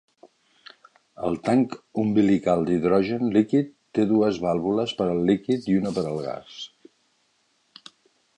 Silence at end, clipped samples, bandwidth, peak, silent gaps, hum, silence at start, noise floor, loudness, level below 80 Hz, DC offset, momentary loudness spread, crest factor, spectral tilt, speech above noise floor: 1.7 s; under 0.1%; 9.8 kHz; -6 dBFS; none; none; 1.2 s; -68 dBFS; -23 LUFS; -58 dBFS; under 0.1%; 10 LU; 18 dB; -7.5 dB/octave; 45 dB